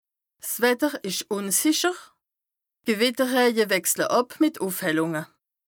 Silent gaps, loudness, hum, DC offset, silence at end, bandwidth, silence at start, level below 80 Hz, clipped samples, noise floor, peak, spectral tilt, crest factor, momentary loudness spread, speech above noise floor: none; -23 LUFS; none; under 0.1%; 0.4 s; over 20 kHz; 0.45 s; -80 dBFS; under 0.1%; -87 dBFS; -8 dBFS; -3 dB/octave; 16 dB; 11 LU; 64 dB